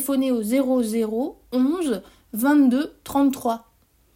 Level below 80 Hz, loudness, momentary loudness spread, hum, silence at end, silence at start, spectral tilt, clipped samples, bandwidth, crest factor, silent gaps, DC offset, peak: -58 dBFS; -22 LUFS; 10 LU; none; 0.6 s; 0 s; -5 dB/octave; under 0.1%; 16.5 kHz; 14 dB; none; under 0.1%; -8 dBFS